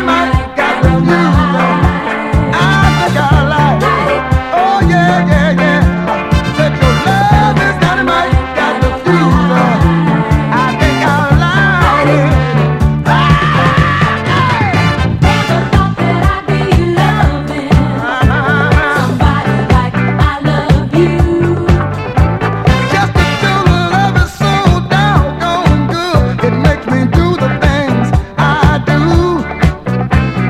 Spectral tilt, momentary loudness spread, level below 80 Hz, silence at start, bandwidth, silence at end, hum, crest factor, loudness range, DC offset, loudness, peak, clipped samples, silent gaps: -6.5 dB/octave; 4 LU; -20 dBFS; 0 s; 14 kHz; 0 s; none; 10 dB; 2 LU; under 0.1%; -11 LUFS; 0 dBFS; 0.8%; none